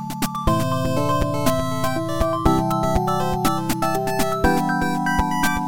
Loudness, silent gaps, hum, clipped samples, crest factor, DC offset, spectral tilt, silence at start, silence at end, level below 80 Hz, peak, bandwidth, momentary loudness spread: -21 LUFS; none; none; under 0.1%; 16 dB; 3%; -5.5 dB/octave; 0 s; 0 s; -32 dBFS; -4 dBFS; 17 kHz; 3 LU